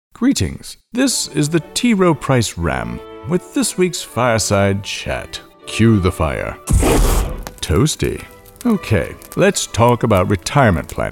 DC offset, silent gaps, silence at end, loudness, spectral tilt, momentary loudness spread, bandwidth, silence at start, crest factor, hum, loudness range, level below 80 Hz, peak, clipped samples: under 0.1%; none; 0 s; -17 LUFS; -5 dB/octave; 11 LU; 17.5 kHz; 0.2 s; 16 dB; none; 2 LU; -28 dBFS; 0 dBFS; under 0.1%